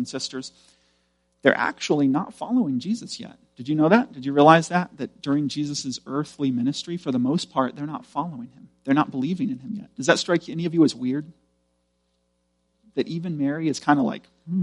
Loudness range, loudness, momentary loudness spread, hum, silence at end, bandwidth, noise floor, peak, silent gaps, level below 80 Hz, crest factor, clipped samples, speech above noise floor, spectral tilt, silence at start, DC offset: 6 LU; -23 LUFS; 15 LU; 60 Hz at -55 dBFS; 0 s; 11.5 kHz; -71 dBFS; 0 dBFS; none; -68 dBFS; 24 dB; under 0.1%; 48 dB; -5.5 dB/octave; 0 s; under 0.1%